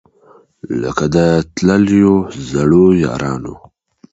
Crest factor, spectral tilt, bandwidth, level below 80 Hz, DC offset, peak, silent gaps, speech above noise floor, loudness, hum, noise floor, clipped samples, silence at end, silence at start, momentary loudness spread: 14 dB; -7 dB/octave; 8 kHz; -38 dBFS; under 0.1%; 0 dBFS; none; 35 dB; -13 LUFS; none; -48 dBFS; under 0.1%; 0.55 s; 0.65 s; 11 LU